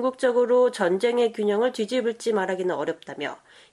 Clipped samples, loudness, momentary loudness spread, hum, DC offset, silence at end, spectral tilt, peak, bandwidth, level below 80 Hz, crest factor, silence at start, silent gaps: under 0.1%; -24 LUFS; 11 LU; none; under 0.1%; 0.35 s; -5 dB/octave; -8 dBFS; 12 kHz; -74 dBFS; 16 dB; 0 s; none